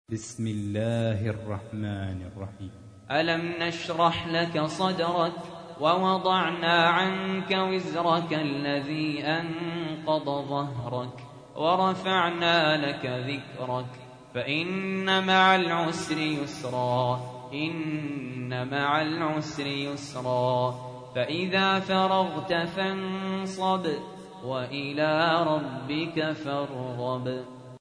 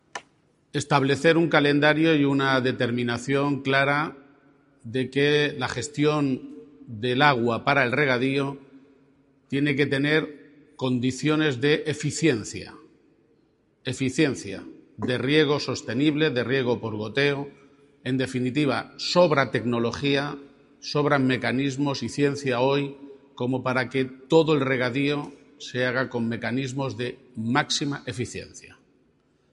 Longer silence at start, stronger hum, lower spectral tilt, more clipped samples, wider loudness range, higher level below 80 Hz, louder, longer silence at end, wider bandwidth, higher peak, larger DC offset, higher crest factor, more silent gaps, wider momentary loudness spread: about the same, 0.1 s vs 0.15 s; neither; about the same, -5.5 dB/octave vs -5.5 dB/octave; neither; about the same, 4 LU vs 5 LU; about the same, -64 dBFS vs -62 dBFS; second, -27 LUFS vs -24 LUFS; second, 0.05 s vs 0.8 s; about the same, 10.5 kHz vs 11.5 kHz; second, -6 dBFS vs -2 dBFS; neither; about the same, 22 dB vs 22 dB; neither; about the same, 11 LU vs 13 LU